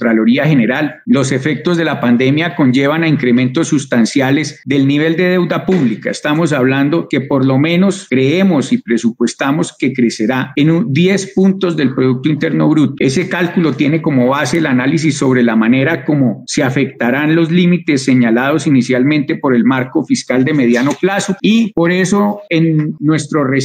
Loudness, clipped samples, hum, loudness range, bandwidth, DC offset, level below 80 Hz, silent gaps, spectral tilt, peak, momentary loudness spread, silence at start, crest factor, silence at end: -13 LUFS; under 0.1%; none; 1 LU; 15.5 kHz; under 0.1%; -54 dBFS; none; -6 dB/octave; -2 dBFS; 4 LU; 0 s; 10 dB; 0 s